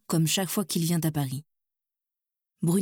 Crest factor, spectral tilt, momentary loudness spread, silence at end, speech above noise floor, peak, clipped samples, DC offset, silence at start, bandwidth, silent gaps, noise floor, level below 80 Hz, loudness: 16 dB; -5 dB/octave; 8 LU; 0 s; 60 dB; -12 dBFS; under 0.1%; under 0.1%; 0.1 s; 19 kHz; none; -87 dBFS; -66 dBFS; -27 LUFS